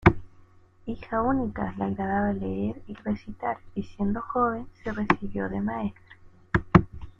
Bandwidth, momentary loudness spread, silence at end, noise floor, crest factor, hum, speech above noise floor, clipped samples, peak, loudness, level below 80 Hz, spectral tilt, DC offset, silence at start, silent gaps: 7 kHz; 13 LU; 0.1 s; -54 dBFS; 26 dB; none; 25 dB; under 0.1%; -2 dBFS; -28 LUFS; -42 dBFS; -9 dB/octave; under 0.1%; 0 s; none